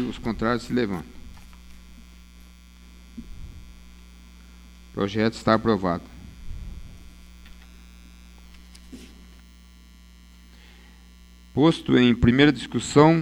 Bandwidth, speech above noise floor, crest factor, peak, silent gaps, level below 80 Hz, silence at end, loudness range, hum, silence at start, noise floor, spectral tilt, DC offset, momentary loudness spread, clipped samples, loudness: 14.5 kHz; 28 dB; 24 dB; -2 dBFS; none; -44 dBFS; 0 s; 25 LU; none; 0 s; -49 dBFS; -6 dB/octave; under 0.1%; 27 LU; under 0.1%; -22 LUFS